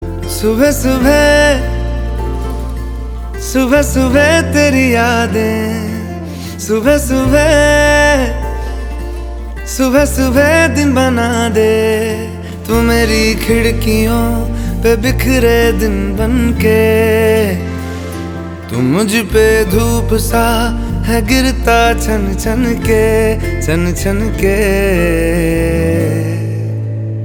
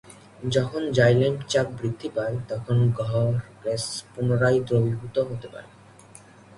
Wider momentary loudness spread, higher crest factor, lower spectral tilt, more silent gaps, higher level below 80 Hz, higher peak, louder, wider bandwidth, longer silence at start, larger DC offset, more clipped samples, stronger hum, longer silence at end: about the same, 12 LU vs 11 LU; second, 12 dB vs 18 dB; about the same, -5.5 dB/octave vs -6 dB/octave; neither; first, -20 dBFS vs -54 dBFS; first, 0 dBFS vs -6 dBFS; first, -12 LUFS vs -24 LUFS; first, 19.5 kHz vs 11.5 kHz; about the same, 0 s vs 0.05 s; neither; neither; neither; second, 0 s vs 0.4 s